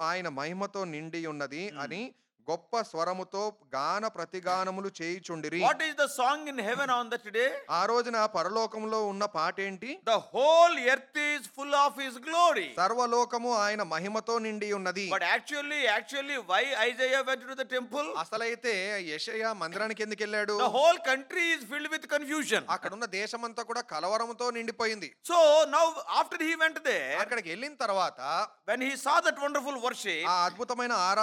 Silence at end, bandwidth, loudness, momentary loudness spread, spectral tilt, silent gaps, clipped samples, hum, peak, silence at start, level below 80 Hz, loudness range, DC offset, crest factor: 0 s; 16.5 kHz; -29 LUFS; 10 LU; -2.5 dB/octave; none; under 0.1%; none; -10 dBFS; 0 s; -90 dBFS; 6 LU; under 0.1%; 20 dB